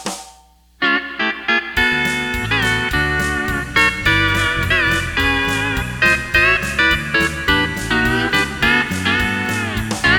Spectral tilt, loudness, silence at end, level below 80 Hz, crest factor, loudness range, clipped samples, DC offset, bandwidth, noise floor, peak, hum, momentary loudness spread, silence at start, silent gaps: -3.5 dB/octave; -16 LUFS; 0 s; -32 dBFS; 16 dB; 2 LU; under 0.1%; under 0.1%; 19 kHz; -49 dBFS; 0 dBFS; none; 6 LU; 0 s; none